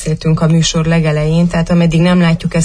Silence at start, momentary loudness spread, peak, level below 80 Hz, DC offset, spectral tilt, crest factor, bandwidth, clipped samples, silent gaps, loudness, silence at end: 0 s; 3 LU; -2 dBFS; -30 dBFS; under 0.1%; -6 dB/octave; 10 dB; 10.5 kHz; under 0.1%; none; -12 LUFS; 0 s